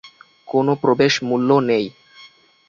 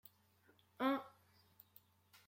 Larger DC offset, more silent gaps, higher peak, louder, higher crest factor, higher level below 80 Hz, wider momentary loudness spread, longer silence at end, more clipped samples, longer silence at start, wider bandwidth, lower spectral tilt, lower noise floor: neither; neither; first, -2 dBFS vs -24 dBFS; first, -18 LUFS vs -41 LUFS; second, 16 dB vs 22 dB; first, -60 dBFS vs under -90 dBFS; second, 6 LU vs 25 LU; second, 0.4 s vs 1.2 s; neither; second, 0.05 s vs 0.8 s; second, 7.4 kHz vs 16.5 kHz; about the same, -5.5 dB/octave vs -5 dB/octave; second, -48 dBFS vs -73 dBFS